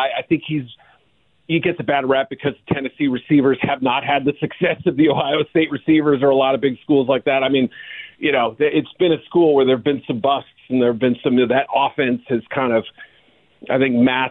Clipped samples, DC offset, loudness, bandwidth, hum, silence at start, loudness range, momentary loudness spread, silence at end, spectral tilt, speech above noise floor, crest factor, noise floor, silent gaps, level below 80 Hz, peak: under 0.1%; under 0.1%; -18 LUFS; 4.1 kHz; none; 0 s; 2 LU; 8 LU; 0 s; -10 dB/octave; 44 dB; 12 dB; -62 dBFS; none; -56 dBFS; -6 dBFS